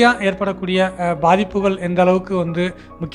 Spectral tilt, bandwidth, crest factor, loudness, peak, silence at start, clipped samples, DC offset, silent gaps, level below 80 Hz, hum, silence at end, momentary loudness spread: -6.5 dB/octave; 11 kHz; 18 dB; -18 LUFS; 0 dBFS; 0 s; under 0.1%; under 0.1%; none; -44 dBFS; none; 0 s; 7 LU